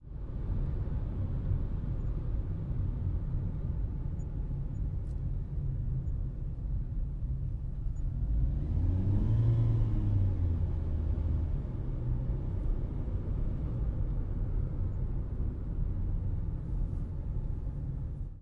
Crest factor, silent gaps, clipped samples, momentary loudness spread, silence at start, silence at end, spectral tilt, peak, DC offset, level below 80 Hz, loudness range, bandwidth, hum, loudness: 14 dB; none; under 0.1%; 8 LU; 0 s; 0 s; -11 dB/octave; -18 dBFS; under 0.1%; -34 dBFS; 6 LU; 3.4 kHz; none; -35 LUFS